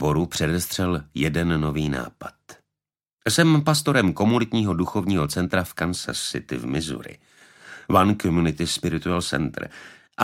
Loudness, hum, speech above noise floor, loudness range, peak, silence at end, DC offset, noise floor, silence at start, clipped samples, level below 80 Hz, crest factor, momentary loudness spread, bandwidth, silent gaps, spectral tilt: -23 LUFS; none; 67 dB; 4 LU; -2 dBFS; 0 s; under 0.1%; -89 dBFS; 0 s; under 0.1%; -44 dBFS; 20 dB; 16 LU; 16.5 kHz; 3.13-3.17 s; -5 dB/octave